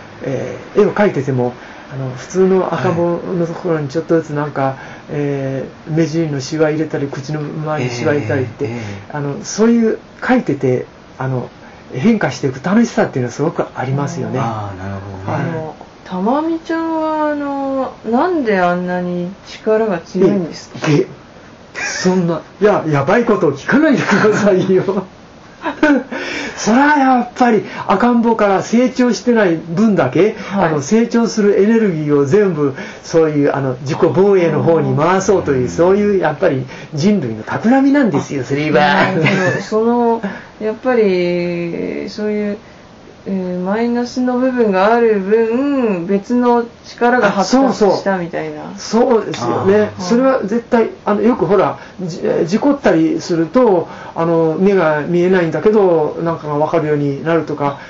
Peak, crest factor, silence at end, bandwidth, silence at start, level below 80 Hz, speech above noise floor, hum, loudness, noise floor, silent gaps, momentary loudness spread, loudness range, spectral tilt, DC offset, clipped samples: -2 dBFS; 12 dB; 0 s; 7.8 kHz; 0 s; -50 dBFS; 24 dB; none; -15 LUFS; -39 dBFS; none; 11 LU; 5 LU; -6 dB/octave; under 0.1%; under 0.1%